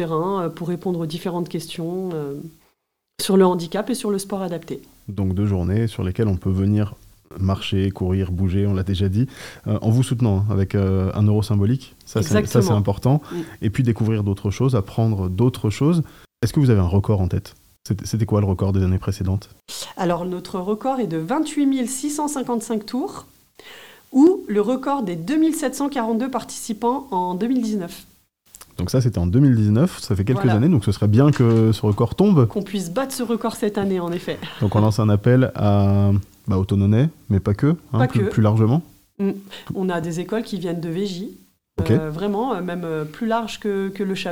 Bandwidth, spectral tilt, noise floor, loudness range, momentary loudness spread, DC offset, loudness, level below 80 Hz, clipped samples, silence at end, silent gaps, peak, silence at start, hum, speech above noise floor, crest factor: 16 kHz; -7 dB/octave; -71 dBFS; 6 LU; 11 LU; 0.2%; -21 LUFS; -50 dBFS; under 0.1%; 0 s; none; -2 dBFS; 0 s; none; 52 dB; 18 dB